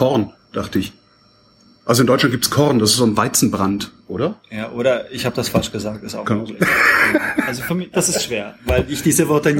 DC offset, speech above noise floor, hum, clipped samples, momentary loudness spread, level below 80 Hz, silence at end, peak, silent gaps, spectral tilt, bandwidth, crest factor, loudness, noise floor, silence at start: under 0.1%; 35 dB; none; under 0.1%; 13 LU; -40 dBFS; 0 s; -2 dBFS; none; -4 dB/octave; 17 kHz; 16 dB; -17 LUFS; -53 dBFS; 0 s